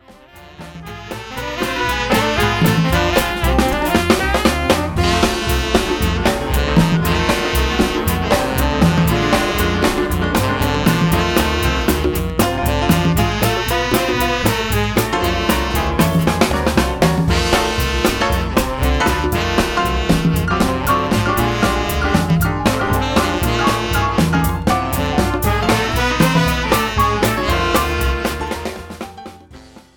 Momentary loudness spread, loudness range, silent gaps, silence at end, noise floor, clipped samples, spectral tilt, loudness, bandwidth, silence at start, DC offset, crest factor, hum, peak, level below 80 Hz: 4 LU; 1 LU; none; 0.15 s; -41 dBFS; under 0.1%; -5 dB/octave; -16 LUFS; 19.5 kHz; 0.1 s; under 0.1%; 16 dB; none; 0 dBFS; -24 dBFS